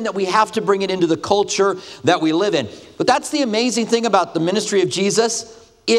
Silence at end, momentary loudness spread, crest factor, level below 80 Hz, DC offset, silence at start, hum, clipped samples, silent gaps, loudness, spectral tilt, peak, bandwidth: 0 s; 5 LU; 18 dB; -60 dBFS; under 0.1%; 0 s; none; under 0.1%; none; -18 LUFS; -3.5 dB/octave; 0 dBFS; 13.5 kHz